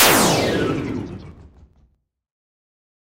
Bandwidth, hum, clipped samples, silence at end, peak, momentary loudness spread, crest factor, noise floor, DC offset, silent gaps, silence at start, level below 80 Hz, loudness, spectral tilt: 16 kHz; none; under 0.1%; 1.6 s; 0 dBFS; 20 LU; 20 dB; -62 dBFS; under 0.1%; none; 0 s; -46 dBFS; -18 LUFS; -3 dB/octave